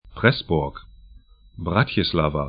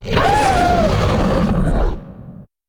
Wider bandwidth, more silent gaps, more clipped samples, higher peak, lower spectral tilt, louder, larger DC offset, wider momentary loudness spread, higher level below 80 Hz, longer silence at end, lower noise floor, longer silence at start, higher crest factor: second, 5.2 kHz vs 19 kHz; neither; neither; about the same, 0 dBFS vs -2 dBFS; first, -11 dB/octave vs -6 dB/octave; second, -22 LUFS vs -16 LUFS; neither; second, 12 LU vs 17 LU; second, -40 dBFS vs -22 dBFS; second, 0 s vs 0.25 s; first, -49 dBFS vs -37 dBFS; about the same, 0.05 s vs 0 s; first, 22 dB vs 14 dB